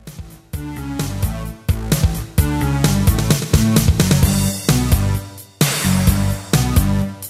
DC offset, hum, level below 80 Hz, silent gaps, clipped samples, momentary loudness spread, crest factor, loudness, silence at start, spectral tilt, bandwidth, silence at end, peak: under 0.1%; none; -24 dBFS; none; under 0.1%; 12 LU; 16 dB; -17 LUFS; 0.05 s; -5 dB/octave; 16 kHz; 0 s; -2 dBFS